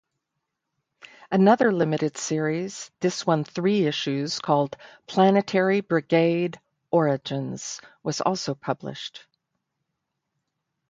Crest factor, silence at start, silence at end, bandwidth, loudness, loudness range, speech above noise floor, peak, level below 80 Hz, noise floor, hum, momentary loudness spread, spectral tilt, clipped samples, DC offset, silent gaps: 20 dB; 1.3 s; 1.7 s; 9.4 kHz; -24 LUFS; 7 LU; 58 dB; -6 dBFS; -70 dBFS; -81 dBFS; none; 12 LU; -5.5 dB/octave; under 0.1%; under 0.1%; none